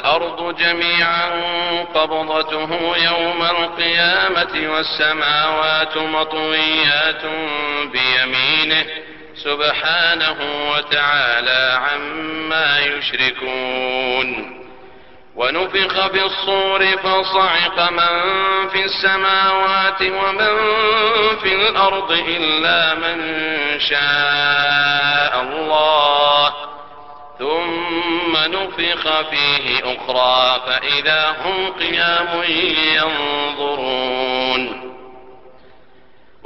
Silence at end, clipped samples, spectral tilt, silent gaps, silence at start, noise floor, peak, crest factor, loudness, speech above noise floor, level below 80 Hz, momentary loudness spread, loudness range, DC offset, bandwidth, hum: 1 s; under 0.1%; -4.5 dB/octave; none; 0 s; -51 dBFS; -2 dBFS; 16 dB; -16 LUFS; 34 dB; -52 dBFS; 7 LU; 4 LU; 0.7%; 6.2 kHz; none